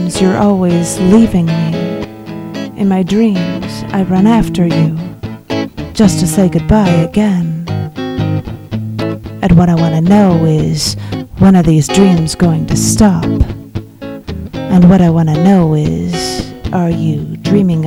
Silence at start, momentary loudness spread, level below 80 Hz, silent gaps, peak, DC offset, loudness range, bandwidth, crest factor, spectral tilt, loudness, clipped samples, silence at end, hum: 0 s; 14 LU; -28 dBFS; none; 0 dBFS; under 0.1%; 3 LU; 15.5 kHz; 10 dB; -6.5 dB/octave; -11 LUFS; 1%; 0 s; none